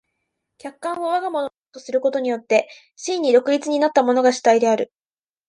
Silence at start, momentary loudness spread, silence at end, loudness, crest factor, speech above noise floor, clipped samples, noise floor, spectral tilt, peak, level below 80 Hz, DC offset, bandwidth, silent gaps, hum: 0.65 s; 15 LU; 0.65 s; -19 LUFS; 18 dB; over 71 dB; under 0.1%; under -90 dBFS; -3.5 dB/octave; -2 dBFS; -74 dBFS; under 0.1%; 11.5 kHz; 1.58-1.62 s; none